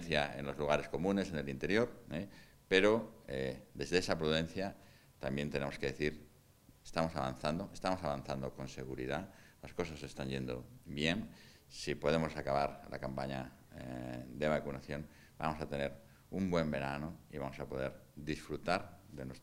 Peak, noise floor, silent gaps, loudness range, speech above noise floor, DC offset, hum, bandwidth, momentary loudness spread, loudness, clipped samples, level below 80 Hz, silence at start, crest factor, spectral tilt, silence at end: -14 dBFS; -64 dBFS; none; 6 LU; 26 dB; under 0.1%; none; 16 kHz; 13 LU; -38 LUFS; under 0.1%; -58 dBFS; 0 s; 24 dB; -5.5 dB/octave; 0 s